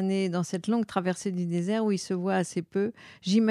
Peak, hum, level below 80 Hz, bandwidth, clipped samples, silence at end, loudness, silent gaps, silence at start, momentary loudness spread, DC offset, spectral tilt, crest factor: -12 dBFS; none; -74 dBFS; 12 kHz; under 0.1%; 0 s; -29 LUFS; none; 0 s; 4 LU; under 0.1%; -6 dB/octave; 16 dB